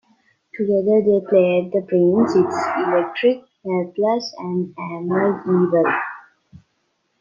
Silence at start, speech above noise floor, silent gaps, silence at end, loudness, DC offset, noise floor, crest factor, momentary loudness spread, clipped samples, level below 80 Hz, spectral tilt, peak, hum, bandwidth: 0.55 s; 51 dB; none; 0.65 s; -19 LUFS; under 0.1%; -69 dBFS; 16 dB; 10 LU; under 0.1%; -66 dBFS; -7.5 dB/octave; -4 dBFS; none; 7.4 kHz